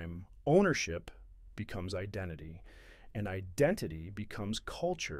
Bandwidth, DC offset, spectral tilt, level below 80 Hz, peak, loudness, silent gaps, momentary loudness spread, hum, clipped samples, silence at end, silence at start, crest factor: 16 kHz; under 0.1%; -5.5 dB/octave; -54 dBFS; -14 dBFS; -35 LUFS; none; 19 LU; none; under 0.1%; 0 s; 0 s; 22 dB